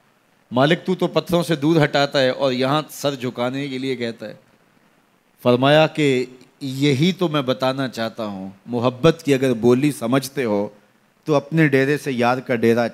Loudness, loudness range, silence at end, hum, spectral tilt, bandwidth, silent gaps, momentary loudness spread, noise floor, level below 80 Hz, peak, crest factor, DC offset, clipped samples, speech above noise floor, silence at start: -19 LUFS; 3 LU; 0 s; none; -6 dB/octave; 16 kHz; none; 11 LU; -59 dBFS; -60 dBFS; -2 dBFS; 18 dB; under 0.1%; under 0.1%; 40 dB; 0.5 s